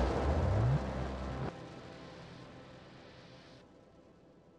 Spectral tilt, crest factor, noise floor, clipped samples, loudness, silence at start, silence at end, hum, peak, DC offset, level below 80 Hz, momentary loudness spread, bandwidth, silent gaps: -7.5 dB/octave; 18 dB; -61 dBFS; under 0.1%; -35 LUFS; 0 s; 0.95 s; none; -20 dBFS; under 0.1%; -44 dBFS; 23 LU; 9.2 kHz; none